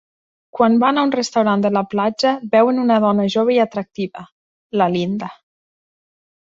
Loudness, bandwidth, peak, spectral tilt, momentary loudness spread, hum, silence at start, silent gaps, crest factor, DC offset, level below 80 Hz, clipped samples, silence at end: -17 LUFS; 7.8 kHz; -2 dBFS; -6 dB/octave; 12 LU; none; 0.55 s; 4.32-4.70 s; 16 dB; under 0.1%; -62 dBFS; under 0.1%; 1.15 s